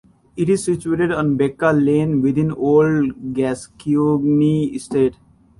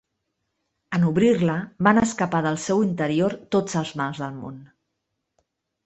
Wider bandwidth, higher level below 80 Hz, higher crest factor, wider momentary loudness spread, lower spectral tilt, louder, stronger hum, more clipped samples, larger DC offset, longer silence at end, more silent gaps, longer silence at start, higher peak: first, 11.5 kHz vs 8.4 kHz; first, -50 dBFS vs -58 dBFS; second, 14 dB vs 20 dB; second, 7 LU vs 10 LU; first, -7.5 dB/octave vs -6 dB/octave; first, -18 LUFS vs -22 LUFS; neither; neither; neither; second, 0.45 s vs 1.2 s; neither; second, 0.35 s vs 0.9 s; about the same, -4 dBFS vs -4 dBFS